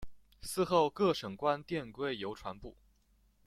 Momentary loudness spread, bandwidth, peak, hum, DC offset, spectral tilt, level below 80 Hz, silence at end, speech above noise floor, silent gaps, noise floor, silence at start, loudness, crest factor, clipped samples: 17 LU; 15.5 kHz; -16 dBFS; none; under 0.1%; -5 dB/octave; -60 dBFS; 0.75 s; 36 dB; none; -70 dBFS; 0 s; -34 LUFS; 20 dB; under 0.1%